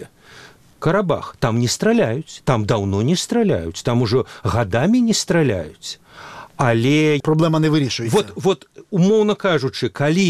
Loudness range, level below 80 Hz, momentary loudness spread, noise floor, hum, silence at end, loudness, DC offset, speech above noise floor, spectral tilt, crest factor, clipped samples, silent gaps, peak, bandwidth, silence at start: 2 LU; -48 dBFS; 9 LU; -45 dBFS; none; 0 s; -18 LUFS; 0.2%; 27 dB; -5.5 dB/octave; 16 dB; under 0.1%; none; -2 dBFS; 14.5 kHz; 0 s